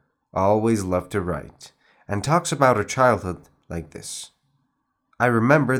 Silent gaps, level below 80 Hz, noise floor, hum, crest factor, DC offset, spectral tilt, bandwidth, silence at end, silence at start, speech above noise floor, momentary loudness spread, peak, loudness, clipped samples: none; -54 dBFS; -73 dBFS; none; 20 dB; under 0.1%; -5.5 dB/octave; 17.5 kHz; 0 s; 0.35 s; 52 dB; 16 LU; -2 dBFS; -21 LUFS; under 0.1%